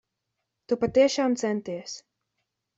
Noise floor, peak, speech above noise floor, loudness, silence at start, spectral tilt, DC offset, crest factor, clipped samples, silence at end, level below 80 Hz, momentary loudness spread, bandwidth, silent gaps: -82 dBFS; -10 dBFS; 57 dB; -25 LUFS; 0.7 s; -4.5 dB/octave; under 0.1%; 18 dB; under 0.1%; 0.8 s; -64 dBFS; 16 LU; 8 kHz; none